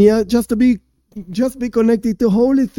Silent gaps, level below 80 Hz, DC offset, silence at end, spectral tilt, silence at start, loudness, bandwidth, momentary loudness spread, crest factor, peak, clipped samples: none; -42 dBFS; under 0.1%; 0.1 s; -7 dB/octave; 0 s; -16 LUFS; 16.5 kHz; 9 LU; 14 dB; 0 dBFS; under 0.1%